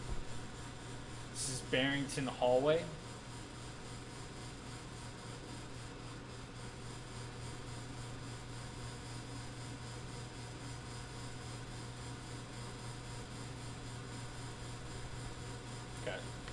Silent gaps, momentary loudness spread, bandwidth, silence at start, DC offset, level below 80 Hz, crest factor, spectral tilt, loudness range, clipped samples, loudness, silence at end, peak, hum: none; 13 LU; 11.5 kHz; 0 s; under 0.1%; -56 dBFS; 22 dB; -4.5 dB/octave; 11 LU; under 0.1%; -43 LUFS; 0 s; -20 dBFS; none